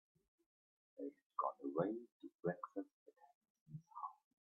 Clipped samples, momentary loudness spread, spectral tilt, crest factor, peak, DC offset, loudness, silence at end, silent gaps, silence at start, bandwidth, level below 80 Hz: under 0.1%; 16 LU; -8.5 dB/octave; 24 dB; -24 dBFS; under 0.1%; -47 LUFS; 0.3 s; 1.26-1.30 s, 2.12-2.20 s, 2.35-2.39 s, 2.93-3.06 s, 3.35-3.41 s, 3.50-3.55 s, 3.61-3.66 s; 1 s; 5.8 kHz; under -90 dBFS